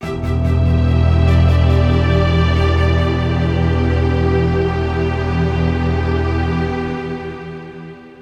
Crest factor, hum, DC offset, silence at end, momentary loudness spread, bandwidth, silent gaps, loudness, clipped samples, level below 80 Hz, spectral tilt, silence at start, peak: 12 dB; none; under 0.1%; 0 s; 12 LU; 6.8 kHz; none; -16 LUFS; under 0.1%; -22 dBFS; -8 dB/octave; 0 s; -2 dBFS